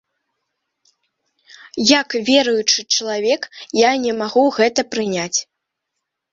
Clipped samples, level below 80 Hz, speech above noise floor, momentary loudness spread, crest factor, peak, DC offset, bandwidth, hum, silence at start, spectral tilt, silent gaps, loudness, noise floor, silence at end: under 0.1%; -64 dBFS; 61 dB; 7 LU; 18 dB; 0 dBFS; under 0.1%; 7.8 kHz; none; 1.75 s; -2 dB/octave; none; -17 LUFS; -78 dBFS; 0.9 s